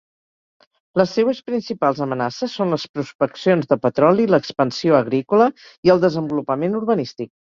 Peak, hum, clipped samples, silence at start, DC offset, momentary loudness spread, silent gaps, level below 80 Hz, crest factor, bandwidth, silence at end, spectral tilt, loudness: -2 dBFS; none; under 0.1%; 0.95 s; under 0.1%; 8 LU; 2.89-2.94 s, 3.15-3.19 s, 5.78-5.83 s; -60 dBFS; 18 dB; 7.4 kHz; 0.3 s; -7 dB/octave; -19 LUFS